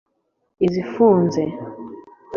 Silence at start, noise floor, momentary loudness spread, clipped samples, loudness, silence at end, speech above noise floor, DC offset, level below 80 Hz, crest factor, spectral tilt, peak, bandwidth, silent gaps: 0.6 s; -39 dBFS; 20 LU; under 0.1%; -19 LUFS; 0 s; 21 dB; under 0.1%; -58 dBFS; 18 dB; -8 dB/octave; -4 dBFS; 7 kHz; none